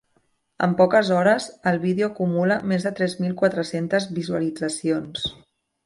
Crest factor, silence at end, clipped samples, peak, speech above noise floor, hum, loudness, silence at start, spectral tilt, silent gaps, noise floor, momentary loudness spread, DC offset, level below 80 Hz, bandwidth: 18 dB; 0.55 s; under 0.1%; -4 dBFS; 45 dB; none; -22 LUFS; 0.6 s; -5.5 dB/octave; none; -67 dBFS; 8 LU; under 0.1%; -60 dBFS; 11.5 kHz